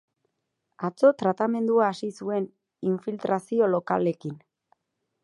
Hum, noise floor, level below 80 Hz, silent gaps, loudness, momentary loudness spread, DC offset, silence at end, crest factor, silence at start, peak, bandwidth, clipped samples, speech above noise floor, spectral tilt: none; -80 dBFS; -76 dBFS; none; -26 LUFS; 13 LU; under 0.1%; 0.85 s; 20 dB; 0.8 s; -6 dBFS; 11.5 kHz; under 0.1%; 55 dB; -7.5 dB/octave